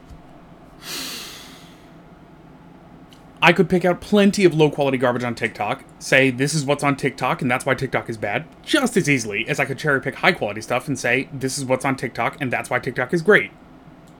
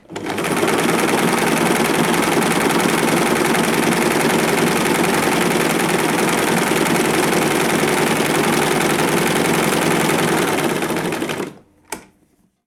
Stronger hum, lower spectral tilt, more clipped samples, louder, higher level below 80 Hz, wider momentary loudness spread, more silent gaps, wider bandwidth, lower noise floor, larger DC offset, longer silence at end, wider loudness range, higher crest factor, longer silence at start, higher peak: neither; about the same, -5 dB/octave vs -4 dB/octave; neither; second, -20 LUFS vs -16 LUFS; about the same, -52 dBFS vs -48 dBFS; first, 12 LU vs 5 LU; neither; about the same, 18.5 kHz vs 19.5 kHz; second, -45 dBFS vs -59 dBFS; neither; second, 0.1 s vs 0.65 s; about the same, 4 LU vs 2 LU; first, 22 dB vs 14 dB; about the same, 0.1 s vs 0.1 s; about the same, 0 dBFS vs -2 dBFS